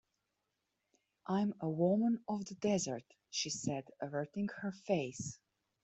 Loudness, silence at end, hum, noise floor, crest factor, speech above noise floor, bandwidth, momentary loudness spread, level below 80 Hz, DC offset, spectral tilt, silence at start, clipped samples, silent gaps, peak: -38 LUFS; 0.5 s; none; -86 dBFS; 18 dB; 49 dB; 8.2 kHz; 12 LU; -76 dBFS; under 0.1%; -5 dB/octave; 1.25 s; under 0.1%; none; -20 dBFS